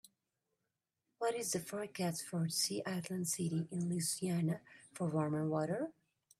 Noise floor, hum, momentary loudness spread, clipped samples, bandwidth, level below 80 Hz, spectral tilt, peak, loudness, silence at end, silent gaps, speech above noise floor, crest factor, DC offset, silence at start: -89 dBFS; none; 6 LU; under 0.1%; 15.5 kHz; -80 dBFS; -4.5 dB/octave; -22 dBFS; -38 LUFS; 0.5 s; none; 51 dB; 16 dB; under 0.1%; 1.2 s